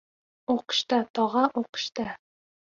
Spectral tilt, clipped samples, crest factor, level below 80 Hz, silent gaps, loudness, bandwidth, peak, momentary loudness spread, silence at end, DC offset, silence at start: -3.5 dB/octave; under 0.1%; 20 dB; -68 dBFS; 1.10-1.14 s, 1.69-1.73 s; -27 LUFS; 7.6 kHz; -8 dBFS; 12 LU; 0.55 s; under 0.1%; 0.5 s